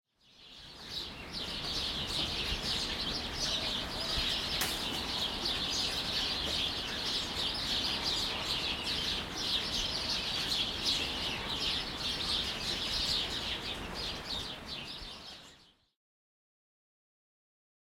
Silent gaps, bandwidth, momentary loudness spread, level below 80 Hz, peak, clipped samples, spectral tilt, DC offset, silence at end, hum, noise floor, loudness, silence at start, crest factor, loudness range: none; 16.5 kHz; 9 LU; -50 dBFS; -18 dBFS; under 0.1%; -2 dB/octave; under 0.1%; 2.35 s; none; -61 dBFS; -33 LUFS; 0.4 s; 18 dB; 8 LU